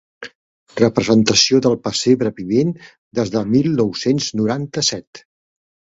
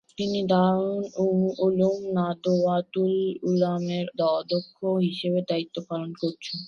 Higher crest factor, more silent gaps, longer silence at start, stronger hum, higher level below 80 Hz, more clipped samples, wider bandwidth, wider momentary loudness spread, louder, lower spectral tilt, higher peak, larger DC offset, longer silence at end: about the same, 18 dB vs 16 dB; first, 0.35-0.67 s, 2.98-3.11 s, 5.07-5.13 s vs none; about the same, 0.2 s vs 0.2 s; neither; first, -52 dBFS vs -68 dBFS; neither; first, 8 kHz vs 7 kHz; first, 19 LU vs 7 LU; first, -17 LUFS vs -25 LUFS; second, -4.5 dB/octave vs -7.5 dB/octave; first, 0 dBFS vs -8 dBFS; neither; first, 0.75 s vs 0 s